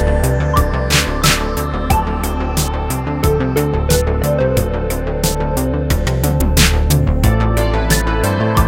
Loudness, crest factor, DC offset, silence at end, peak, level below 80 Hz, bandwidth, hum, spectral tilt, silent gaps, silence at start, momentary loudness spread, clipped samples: -16 LUFS; 14 dB; under 0.1%; 0 s; 0 dBFS; -18 dBFS; 17 kHz; none; -5 dB/octave; none; 0 s; 6 LU; under 0.1%